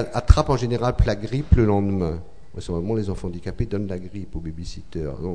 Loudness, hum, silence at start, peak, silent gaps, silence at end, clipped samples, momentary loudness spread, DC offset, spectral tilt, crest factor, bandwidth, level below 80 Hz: -23 LUFS; none; 0 s; 0 dBFS; none; 0 s; under 0.1%; 16 LU; 2%; -7.5 dB/octave; 22 dB; 10 kHz; -28 dBFS